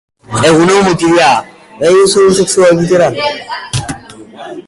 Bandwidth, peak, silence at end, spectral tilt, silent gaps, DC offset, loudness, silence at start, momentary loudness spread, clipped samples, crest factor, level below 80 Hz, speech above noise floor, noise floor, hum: 11.5 kHz; 0 dBFS; 0.05 s; -4.5 dB/octave; none; under 0.1%; -9 LUFS; 0.3 s; 14 LU; under 0.1%; 10 dB; -40 dBFS; 22 dB; -31 dBFS; none